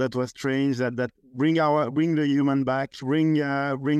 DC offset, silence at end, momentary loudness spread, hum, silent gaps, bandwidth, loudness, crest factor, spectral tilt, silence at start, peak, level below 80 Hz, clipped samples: under 0.1%; 0 s; 6 LU; none; none; 9 kHz; -24 LUFS; 12 dB; -7 dB/octave; 0 s; -12 dBFS; -66 dBFS; under 0.1%